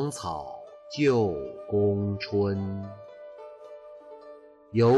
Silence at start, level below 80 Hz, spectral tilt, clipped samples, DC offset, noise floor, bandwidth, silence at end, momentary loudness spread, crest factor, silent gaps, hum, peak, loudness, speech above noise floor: 0 s; -60 dBFS; -7 dB/octave; under 0.1%; under 0.1%; -49 dBFS; 12 kHz; 0 s; 22 LU; 14 dB; none; none; -12 dBFS; -28 LUFS; 22 dB